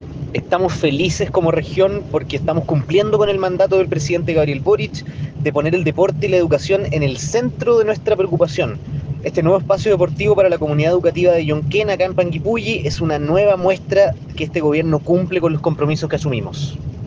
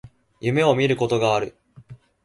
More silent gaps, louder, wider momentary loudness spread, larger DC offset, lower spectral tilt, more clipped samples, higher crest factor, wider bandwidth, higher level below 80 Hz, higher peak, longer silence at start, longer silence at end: neither; first, -17 LUFS vs -21 LUFS; about the same, 7 LU vs 9 LU; neither; about the same, -6.5 dB/octave vs -6 dB/octave; neither; about the same, 14 dB vs 18 dB; second, 9.4 kHz vs 11.5 kHz; first, -42 dBFS vs -58 dBFS; about the same, -2 dBFS vs -4 dBFS; about the same, 0 s vs 0.05 s; second, 0 s vs 0.3 s